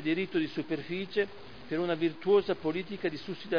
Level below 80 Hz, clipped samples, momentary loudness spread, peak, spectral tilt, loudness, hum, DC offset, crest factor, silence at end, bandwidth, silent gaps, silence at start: -66 dBFS; under 0.1%; 10 LU; -14 dBFS; -7.5 dB/octave; -32 LUFS; none; 0.4%; 18 dB; 0 s; 5.4 kHz; none; 0 s